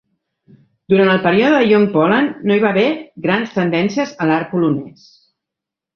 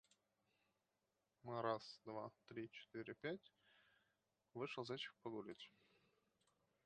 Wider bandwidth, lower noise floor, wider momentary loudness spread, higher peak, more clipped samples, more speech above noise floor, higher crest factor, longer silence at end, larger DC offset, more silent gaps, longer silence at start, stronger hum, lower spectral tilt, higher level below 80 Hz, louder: second, 6.6 kHz vs 8.8 kHz; second, -84 dBFS vs -90 dBFS; second, 6 LU vs 12 LU; first, 0 dBFS vs -28 dBFS; neither; first, 69 dB vs 39 dB; second, 16 dB vs 26 dB; about the same, 1.05 s vs 1.15 s; neither; neither; second, 0.9 s vs 1.45 s; neither; first, -7 dB/octave vs -5.5 dB/octave; first, -58 dBFS vs under -90 dBFS; first, -15 LUFS vs -51 LUFS